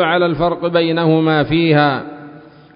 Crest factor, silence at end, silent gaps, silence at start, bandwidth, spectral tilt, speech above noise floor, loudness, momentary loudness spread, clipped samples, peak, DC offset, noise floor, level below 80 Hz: 14 dB; 0.35 s; none; 0 s; 5.4 kHz; -12 dB/octave; 25 dB; -15 LUFS; 10 LU; under 0.1%; -2 dBFS; under 0.1%; -39 dBFS; -46 dBFS